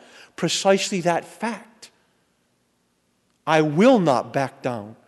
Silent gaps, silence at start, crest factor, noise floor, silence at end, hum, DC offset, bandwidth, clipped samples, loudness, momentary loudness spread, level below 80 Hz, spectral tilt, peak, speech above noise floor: none; 0.4 s; 20 dB; -68 dBFS; 0.15 s; 60 Hz at -55 dBFS; under 0.1%; 12 kHz; under 0.1%; -21 LUFS; 14 LU; -70 dBFS; -5 dB/octave; -4 dBFS; 47 dB